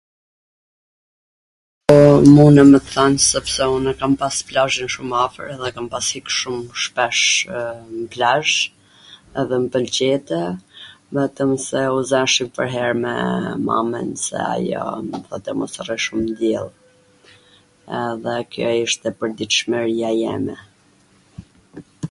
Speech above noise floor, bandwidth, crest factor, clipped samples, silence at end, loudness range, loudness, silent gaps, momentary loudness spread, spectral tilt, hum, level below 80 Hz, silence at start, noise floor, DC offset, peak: 37 dB; 11.5 kHz; 18 dB; under 0.1%; 0.05 s; 11 LU; -18 LUFS; none; 16 LU; -4.5 dB/octave; none; -48 dBFS; 1.9 s; -55 dBFS; under 0.1%; 0 dBFS